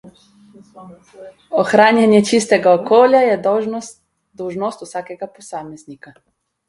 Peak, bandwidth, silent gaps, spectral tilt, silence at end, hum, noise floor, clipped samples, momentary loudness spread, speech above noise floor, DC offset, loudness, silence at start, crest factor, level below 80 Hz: 0 dBFS; 11.5 kHz; none; -5 dB/octave; 0.75 s; none; -47 dBFS; under 0.1%; 20 LU; 31 dB; under 0.1%; -14 LUFS; 0.05 s; 16 dB; -62 dBFS